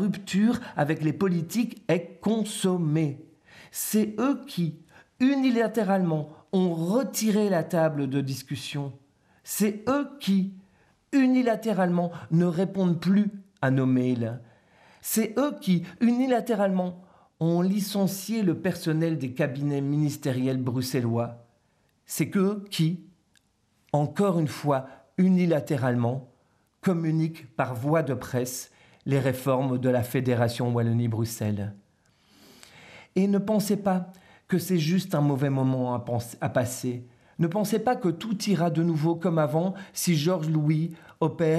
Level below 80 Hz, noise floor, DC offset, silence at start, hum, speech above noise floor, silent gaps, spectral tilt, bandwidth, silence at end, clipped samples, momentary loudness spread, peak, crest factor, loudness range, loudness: -70 dBFS; -69 dBFS; under 0.1%; 0 s; none; 43 dB; none; -6.5 dB/octave; 14.5 kHz; 0 s; under 0.1%; 7 LU; -10 dBFS; 16 dB; 3 LU; -26 LUFS